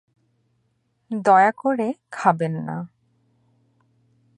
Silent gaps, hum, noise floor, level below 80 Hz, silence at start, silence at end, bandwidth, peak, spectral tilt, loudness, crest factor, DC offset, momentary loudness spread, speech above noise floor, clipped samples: none; none; -69 dBFS; -74 dBFS; 1.1 s; 1.5 s; 10.5 kHz; -2 dBFS; -7 dB/octave; -21 LUFS; 22 dB; under 0.1%; 16 LU; 49 dB; under 0.1%